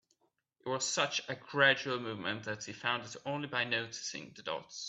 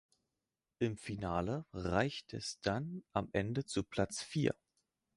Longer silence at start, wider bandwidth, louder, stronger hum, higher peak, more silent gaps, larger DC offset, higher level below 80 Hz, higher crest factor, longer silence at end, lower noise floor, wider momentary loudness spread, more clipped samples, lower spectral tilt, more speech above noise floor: second, 0.65 s vs 0.8 s; second, 8.4 kHz vs 11.5 kHz; first, -34 LUFS vs -38 LUFS; neither; first, -12 dBFS vs -16 dBFS; neither; neither; second, -80 dBFS vs -58 dBFS; about the same, 24 dB vs 22 dB; second, 0 s vs 0.65 s; second, -77 dBFS vs under -90 dBFS; first, 13 LU vs 5 LU; neither; second, -2.5 dB/octave vs -5.5 dB/octave; second, 42 dB vs over 52 dB